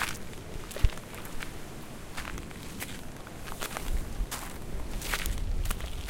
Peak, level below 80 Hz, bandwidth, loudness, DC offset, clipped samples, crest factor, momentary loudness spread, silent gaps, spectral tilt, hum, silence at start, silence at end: -8 dBFS; -36 dBFS; 17 kHz; -37 LUFS; under 0.1%; under 0.1%; 26 dB; 10 LU; none; -3.5 dB/octave; none; 0 s; 0 s